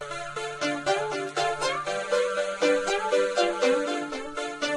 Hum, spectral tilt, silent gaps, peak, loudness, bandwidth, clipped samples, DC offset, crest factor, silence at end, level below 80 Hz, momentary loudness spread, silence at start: none; -2.5 dB/octave; none; -10 dBFS; -27 LUFS; 12 kHz; under 0.1%; under 0.1%; 16 dB; 0 s; -60 dBFS; 9 LU; 0 s